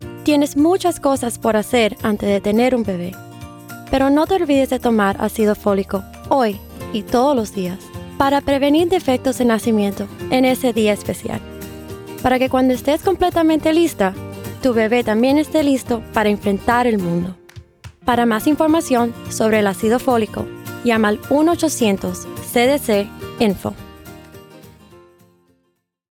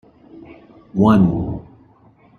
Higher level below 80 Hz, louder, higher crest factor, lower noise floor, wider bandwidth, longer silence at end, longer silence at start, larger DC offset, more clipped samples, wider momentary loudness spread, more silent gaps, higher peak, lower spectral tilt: about the same, -44 dBFS vs -44 dBFS; about the same, -17 LUFS vs -17 LUFS; about the same, 16 dB vs 18 dB; first, -68 dBFS vs -51 dBFS; first, 19 kHz vs 6.6 kHz; first, 1.45 s vs 0.8 s; second, 0 s vs 0.35 s; neither; neither; about the same, 13 LU vs 15 LU; neither; about the same, -2 dBFS vs -2 dBFS; second, -5 dB/octave vs -9.5 dB/octave